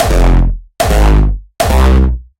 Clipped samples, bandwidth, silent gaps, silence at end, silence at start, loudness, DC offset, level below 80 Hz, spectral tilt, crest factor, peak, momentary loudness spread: under 0.1%; 16.5 kHz; none; 0.2 s; 0 s; -12 LUFS; under 0.1%; -10 dBFS; -6 dB/octave; 8 dB; 0 dBFS; 7 LU